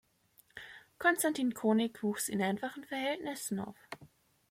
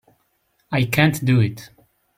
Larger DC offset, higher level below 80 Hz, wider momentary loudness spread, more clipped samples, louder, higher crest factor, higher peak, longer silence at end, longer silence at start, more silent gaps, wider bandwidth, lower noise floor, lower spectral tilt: neither; second, -76 dBFS vs -52 dBFS; first, 20 LU vs 9 LU; neither; second, -33 LUFS vs -19 LUFS; about the same, 22 dB vs 20 dB; second, -14 dBFS vs -2 dBFS; about the same, 0.45 s vs 0.5 s; second, 0.55 s vs 0.7 s; neither; about the same, 16.5 kHz vs 16.5 kHz; about the same, -68 dBFS vs -67 dBFS; second, -4 dB/octave vs -6 dB/octave